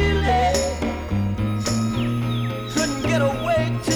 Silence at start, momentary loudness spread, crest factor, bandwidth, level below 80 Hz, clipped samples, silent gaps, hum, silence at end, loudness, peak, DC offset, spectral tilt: 0 s; 6 LU; 12 dB; 19.5 kHz; -32 dBFS; under 0.1%; none; none; 0 s; -22 LUFS; -8 dBFS; under 0.1%; -5 dB/octave